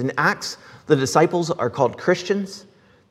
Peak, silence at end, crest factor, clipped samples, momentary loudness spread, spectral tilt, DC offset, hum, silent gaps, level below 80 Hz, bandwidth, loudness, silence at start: 0 dBFS; 0.5 s; 20 dB; under 0.1%; 14 LU; -5 dB/octave; under 0.1%; none; none; -66 dBFS; 15 kHz; -21 LUFS; 0 s